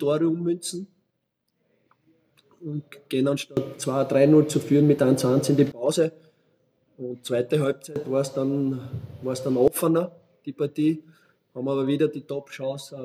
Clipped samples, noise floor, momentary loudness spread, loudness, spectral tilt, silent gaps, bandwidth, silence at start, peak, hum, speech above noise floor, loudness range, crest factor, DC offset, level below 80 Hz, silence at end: under 0.1%; -77 dBFS; 15 LU; -24 LUFS; -6.5 dB/octave; none; 16 kHz; 0 s; -6 dBFS; none; 53 dB; 9 LU; 18 dB; under 0.1%; -64 dBFS; 0 s